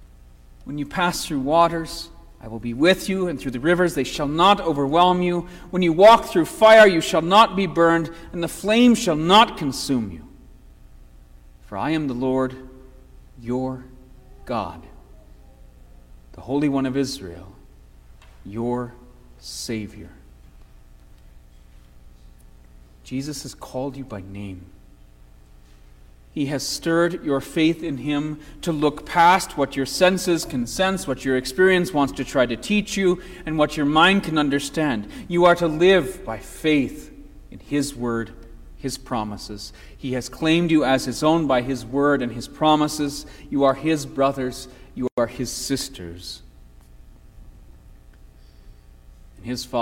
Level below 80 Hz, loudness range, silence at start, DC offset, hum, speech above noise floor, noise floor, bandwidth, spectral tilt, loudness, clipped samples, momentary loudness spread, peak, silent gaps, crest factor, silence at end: -44 dBFS; 18 LU; 0 s; under 0.1%; none; 27 dB; -48 dBFS; 16.5 kHz; -5 dB/octave; -20 LUFS; under 0.1%; 19 LU; -2 dBFS; 45.12-45.17 s; 20 dB; 0 s